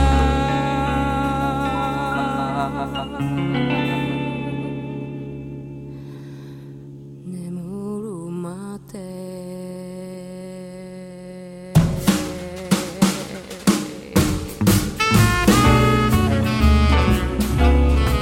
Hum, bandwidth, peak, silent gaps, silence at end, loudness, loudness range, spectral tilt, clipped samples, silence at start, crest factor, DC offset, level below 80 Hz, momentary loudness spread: none; 16.5 kHz; -2 dBFS; none; 0 s; -20 LUFS; 16 LU; -5.5 dB/octave; under 0.1%; 0 s; 18 dB; under 0.1%; -26 dBFS; 19 LU